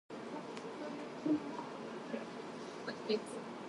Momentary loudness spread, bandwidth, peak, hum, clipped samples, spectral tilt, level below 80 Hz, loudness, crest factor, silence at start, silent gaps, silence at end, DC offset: 9 LU; 11.5 kHz; -24 dBFS; none; under 0.1%; -5 dB/octave; -82 dBFS; -42 LUFS; 18 dB; 0.1 s; none; 0 s; under 0.1%